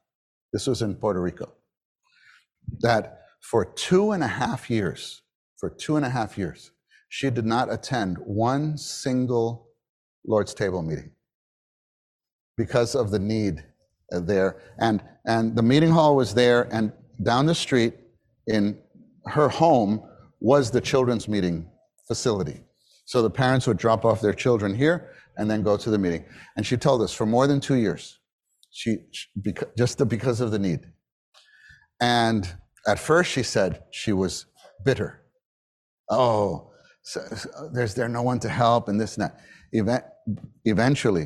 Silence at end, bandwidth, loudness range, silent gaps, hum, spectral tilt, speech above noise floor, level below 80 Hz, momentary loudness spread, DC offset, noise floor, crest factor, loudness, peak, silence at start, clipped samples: 0 s; 13.5 kHz; 7 LU; 1.77-1.96 s, 5.35-5.56 s, 9.89-10.22 s, 11.34-12.19 s, 12.33-12.55 s, 28.32-28.39 s, 31.12-31.32 s, 35.45-36.04 s; none; -6 dB/octave; 35 dB; -54 dBFS; 13 LU; under 0.1%; -58 dBFS; 20 dB; -24 LUFS; -4 dBFS; 0.55 s; under 0.1%